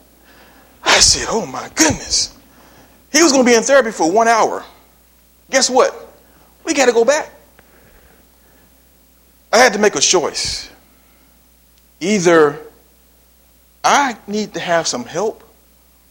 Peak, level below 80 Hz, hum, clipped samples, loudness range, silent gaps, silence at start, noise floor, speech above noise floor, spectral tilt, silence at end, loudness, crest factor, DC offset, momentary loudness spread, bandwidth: 0 dBFS; -44 dBFS; none; under 0.1%; 6 LU; none; 0.85 s; -51 dBFS; 37 dB; -2 dB/octave; 0.75 s; -14 LUFS; 18 dB; under 0.1%; 13 LU; 17 kHz